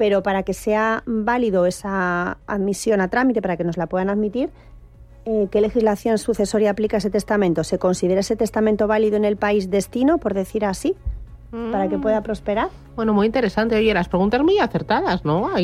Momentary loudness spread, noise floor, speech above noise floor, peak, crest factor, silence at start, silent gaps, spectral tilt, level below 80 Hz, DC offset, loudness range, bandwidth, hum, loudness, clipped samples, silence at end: 6 LU; -44 dBFS; 24 dB; -4 dBFS; 14 dB; 0 s; none; -6 dB/octave; -40 dBFS; under 0.1%; 3 LU; 15 kHz; none; -20 LUFS; under 0.1%; 0 s